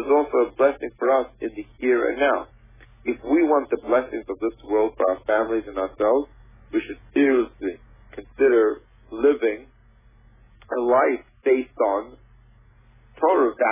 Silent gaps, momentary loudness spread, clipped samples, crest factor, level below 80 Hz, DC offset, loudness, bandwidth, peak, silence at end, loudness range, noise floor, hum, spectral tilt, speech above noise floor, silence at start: none; 13 LU; under 0.1%; 16 dB; -52 dBFS; under 0.1%; -22 LUFS; 3.7 kHz; -8 dBFS; 0 s; 2 LU; -54 dBFS; none; -9 dB/octave; 32 dB; 0 s